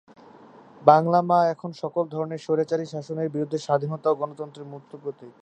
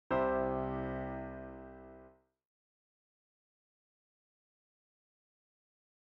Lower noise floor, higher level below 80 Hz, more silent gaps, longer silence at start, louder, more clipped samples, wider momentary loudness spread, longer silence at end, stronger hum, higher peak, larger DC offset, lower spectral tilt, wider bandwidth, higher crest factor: second, -49 dBFS vs -61 dBFS; second, -74 dBFS vs -58 dBFS; neither; first, 0.8 s vs 0.1 s; first, -24 LUFS vs -37 LUFS; neither; about the same, 19 LU vs 21 LU; second, 0.1 s vs 3.95 s; neither; first, -2 dBFS vs -22 dBFS; neither; about the same, -7.5 dB/octave vs -6.5 dB/octave; first, 9 kHz vs 5.4 kHz; about the same, 24 dB vs 20 dB